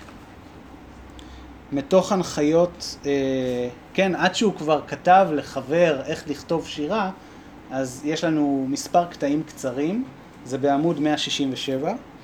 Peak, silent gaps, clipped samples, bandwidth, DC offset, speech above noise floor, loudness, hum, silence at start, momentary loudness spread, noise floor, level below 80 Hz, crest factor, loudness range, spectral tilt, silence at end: -4 dBFS; none; under 0.1%; 16 kHz; under 0.1%; 21 dB; -23 LUFS; none; 0 s; 16 LU; -43 dBFS; -52 dBFS; 20 dB; 4 LU; -5 dB/octave; 0 s